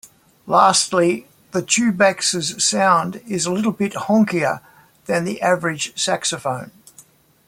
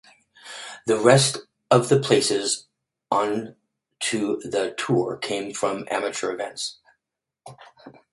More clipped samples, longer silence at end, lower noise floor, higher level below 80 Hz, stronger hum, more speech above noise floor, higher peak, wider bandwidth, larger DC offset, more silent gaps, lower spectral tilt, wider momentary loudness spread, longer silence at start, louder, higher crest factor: neither; first, 0.45 s vs 0.25 s; second, -50 dBFS vs -83 dBFS; about the same, -62 dBFS vs -66 dBFS; neither; second, 32 dB vs 60 dB; about the same, -2 dBFS vs 0 dBFS; first, 16.5 kHz vs 11.5 kHz; neither; neither; about the same, -3.5 dB/octave vs -4 dB/octave; about the same, 12 LU vs 14 LU; about the same, 0.45 s vs 0.45 s; first, -18 LUFS vs -23 LUFS; second, 18 dB vs 24 dB